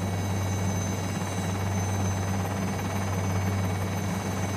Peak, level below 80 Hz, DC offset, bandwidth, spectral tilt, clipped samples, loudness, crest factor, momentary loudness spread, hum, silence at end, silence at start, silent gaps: -16 dBFS; -50 dBFS; under 0.1%; 15.5 kHz; -5.5 dB/octave; under 0.1%; -29 LUFS; 12 dB; 2 LU; none; 0 s; 0 s; none